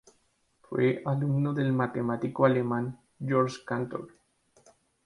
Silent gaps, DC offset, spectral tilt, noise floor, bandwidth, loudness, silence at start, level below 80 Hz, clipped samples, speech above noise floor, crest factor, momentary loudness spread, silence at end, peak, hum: none; under 0.1%; -8 dB/octave; -70 dBFS; 11 kHz; -29 LUFS; 0.7 s; -68 dBFS; under 0.1%; 43 dB; 22 dB; 12 LU; 0.95 s; -8 dBFS; none